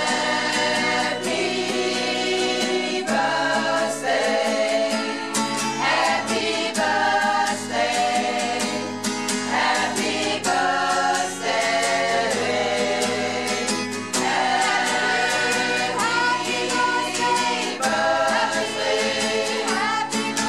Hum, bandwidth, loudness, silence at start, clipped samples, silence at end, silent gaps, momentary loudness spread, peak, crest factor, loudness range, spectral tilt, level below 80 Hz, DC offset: none; 15.5 kHz; -21 LUFS; 0 s; under 0.1%; 0 s; none; 4 LU; -8 dBFS; 14 dB; 1 LU; -2 dB/octave; -66 dBFS; 0.3%